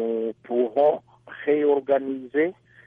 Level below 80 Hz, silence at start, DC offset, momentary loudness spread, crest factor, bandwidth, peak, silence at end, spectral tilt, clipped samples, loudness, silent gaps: -74 dBFS; 0 s; under 0.1%; 10 LU; 14 dB; 3.8 kHz; -10 dBFS; 0.35 s; -8.5 dB/octave; under 0.1%; -24 LUFS; none